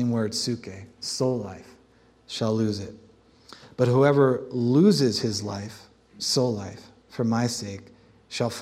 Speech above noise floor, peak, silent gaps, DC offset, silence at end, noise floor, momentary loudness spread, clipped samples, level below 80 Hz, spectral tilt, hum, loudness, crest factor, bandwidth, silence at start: 34 dB; -6 dBFS; none; under 0.1%; 0 s; -58 dBFS; 21 LU; under 0.1%; -64 dBFS; -5.5 dB/octave; none; -24 LUFS; 20 dB; 15 kHz; 0 s